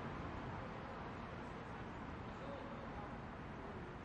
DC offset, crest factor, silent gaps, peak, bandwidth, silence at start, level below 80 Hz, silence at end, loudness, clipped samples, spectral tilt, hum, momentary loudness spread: under 0.1%; 12 dB; none; -36 dBFS; 10.5 kHz; 0 s; -60 dBFS; 0 s; -49 LUFS; under 0.1%; -7 dB/octave; none; 3 LU